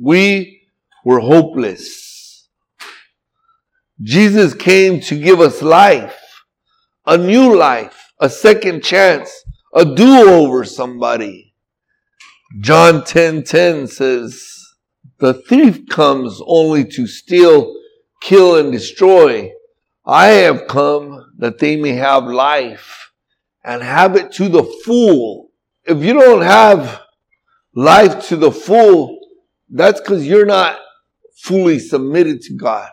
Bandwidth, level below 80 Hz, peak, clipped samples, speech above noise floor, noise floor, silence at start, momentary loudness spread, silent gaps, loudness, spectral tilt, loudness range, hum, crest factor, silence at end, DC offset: 16 kHz; -54 dBFS; 0 dBFS; 0.6%; 62 dB; -72 dBFS; 0 s; 15 LU; none; -10 LUFS; -5.5 dB/octave; 5 LU; none; 12 dB; 0.05 s; under 0.1%